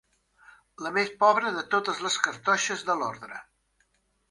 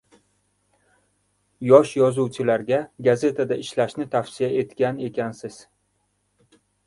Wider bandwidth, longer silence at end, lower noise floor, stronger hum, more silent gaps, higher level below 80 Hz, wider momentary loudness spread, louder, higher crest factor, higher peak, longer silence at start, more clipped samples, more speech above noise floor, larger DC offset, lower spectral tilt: about the same, 11.5 kHz vs 11.5 kHz; second, 0.9 s vs 1.3 s; about the same, -71 dBFS vs -70 dBFS; second, none vs 50 Hz at -60 dBFS; neither; second, -72 dBFS vs -64 dBFS; first, 16 LU vs 13 LU; second, -26 LUFS vs -22 LUFS; about the same, 24 dB vs 22 dB; second, -6 dBFS vs 0 dBFS; second, 0.8 s vs 1.6 s; neither; second, 44 dB vs 49 dB; neither; second, -2 dB/octave vs -6.5 dB/octave